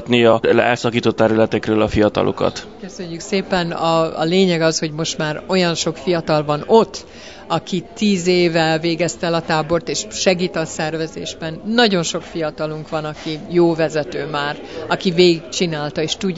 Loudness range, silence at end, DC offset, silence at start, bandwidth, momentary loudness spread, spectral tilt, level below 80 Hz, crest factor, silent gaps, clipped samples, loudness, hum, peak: 2 LU; 0 s; 0.4%; 0 s; 8 kHz; 11 LU; -4.5 dB/octave; -46 dBFS; 18 dB; none; under 0.1%; -18 LUFS; none; 0 dBFS